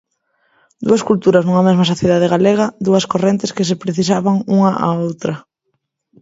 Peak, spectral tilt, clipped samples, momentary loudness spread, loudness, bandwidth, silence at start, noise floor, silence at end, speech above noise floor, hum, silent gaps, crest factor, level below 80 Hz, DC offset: 0 dBFS; -6.5 dB/octave; under 0.1%; 7 LU; -15 LUFS; 8 kHz; 0.8 s; -71 dBFS; 0.8 s; 57 dB; none; none; 16 dB; -54 dBFS; under 0.1%